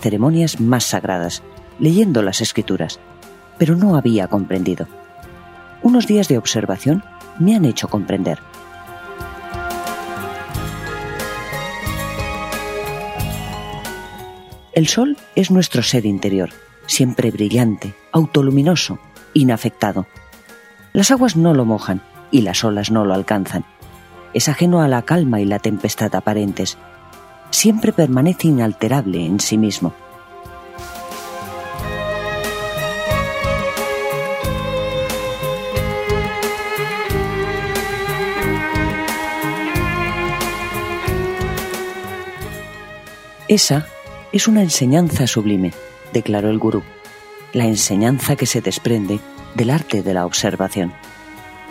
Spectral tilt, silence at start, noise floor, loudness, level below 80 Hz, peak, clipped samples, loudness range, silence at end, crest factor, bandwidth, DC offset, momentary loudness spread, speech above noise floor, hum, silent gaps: -5 dB/octave; 0 s; -43 dBFS; -18 LUFS; -38 dBFS; 0 dBFS; under 0.1%; 8 LU; 0 s; 18 dB; 16 kHz; under 0.1%; 16 LU; 27 dB; none; none